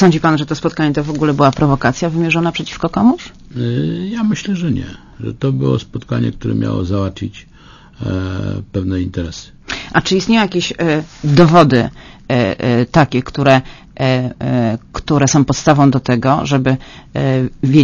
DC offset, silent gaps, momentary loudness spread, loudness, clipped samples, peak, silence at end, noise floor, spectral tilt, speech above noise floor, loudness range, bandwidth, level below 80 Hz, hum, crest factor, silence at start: under 0.1%; none; 11 LU; -15 LUFS; 0.2%; 0 dBFS; 0 s; -41 dBFS; -6 dB/octave; 27 dB; 7 LU; 7.4 kHz; -38 dBFS; none; 14 dB; 0 s